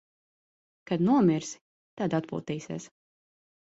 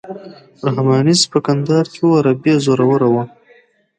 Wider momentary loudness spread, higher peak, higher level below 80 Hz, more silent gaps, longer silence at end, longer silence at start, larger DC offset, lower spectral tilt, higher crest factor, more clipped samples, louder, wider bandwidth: first, 17 LU vs 10 LU; second, -12 dBFS vs 0 dBFS; second, -68 dBFS vs -60 dBFS; first, 1.61-1.97 s vs none; first, 0.95 s vs 0.7 s; first, 0.9 s vs 0.05 s; neither; about the same, -6.5 dB/octave vs -5.5 dB/octave; about the same, 18 dB vs 14 dB; neither; second, -28 LUFS vs -14 LUFS; second, 8 kHz vs 11 kHz